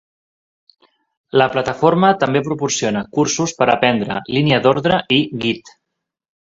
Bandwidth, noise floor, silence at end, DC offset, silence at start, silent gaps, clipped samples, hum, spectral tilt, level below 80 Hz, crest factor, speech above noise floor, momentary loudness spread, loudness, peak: 8 kHz; -79 dBFS; 0.9 s; under 0.1%; 1.35 s; none; under 0.1%; none; -4.5 dB/octave; -54 dBFS; 18 dB; 63 dB; 6 LU; -16 LUFS; 0 dBFS